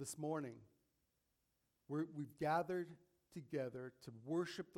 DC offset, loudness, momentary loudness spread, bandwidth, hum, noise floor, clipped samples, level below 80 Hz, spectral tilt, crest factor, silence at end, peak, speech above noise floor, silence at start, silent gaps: under 0.1%; -45 LUFS; 16 LU; 16.5 kHz; none; -85 dBFS; under 0.1%; -82 dBFS; -5.5 dB/octave; 20 dB; 0 s; -26 dBFS; 41 dB; 0 s; none